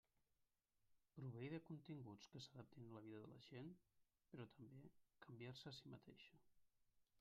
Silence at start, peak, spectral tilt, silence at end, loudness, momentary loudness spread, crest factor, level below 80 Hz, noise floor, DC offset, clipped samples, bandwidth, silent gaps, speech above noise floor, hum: 0.4 s; -40 dBFS; -5.5 dB/octave; 0 s; -60 LUFS; 11 LU; 20 dB; -88 dBFS; -88 dBFS; under 0.1%; under 0.1%; 7.2 kHz; none; 29 dB; none